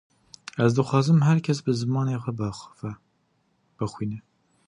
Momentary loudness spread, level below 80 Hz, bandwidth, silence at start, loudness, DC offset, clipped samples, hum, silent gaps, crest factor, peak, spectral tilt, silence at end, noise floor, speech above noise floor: 18 LU; -58 dBFS; 10.5 kHz; 0.55 s; -24 LUFS; under 0.1%; under 0.1%; none; none; 20 dB; -6 dBFS; -7 dB/octave; 0.45 s; -69 dBFS; 46 dB